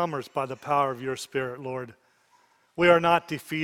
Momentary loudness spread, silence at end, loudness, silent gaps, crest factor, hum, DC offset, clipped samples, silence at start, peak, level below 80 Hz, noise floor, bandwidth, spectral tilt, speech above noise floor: 16 LU; 0 s; -26 LUFS; none; 22 dB; none; under 0.1%; under 0.1%; 0 s; -4 dBFS; -64 dBFS; -64 dBFS; 16 kHz; -5.5 dB/octave; 38 dB